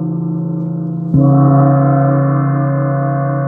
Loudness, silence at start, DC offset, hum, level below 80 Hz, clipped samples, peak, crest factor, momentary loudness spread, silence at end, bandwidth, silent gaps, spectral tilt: -13 LUFS; 0 s; under 0.1%; none; -44 dBFS; under 0.1%; -2 dBFS; 12 dB; 10 LU; 0 s; 2.2 kHz; none; -14 dB/octave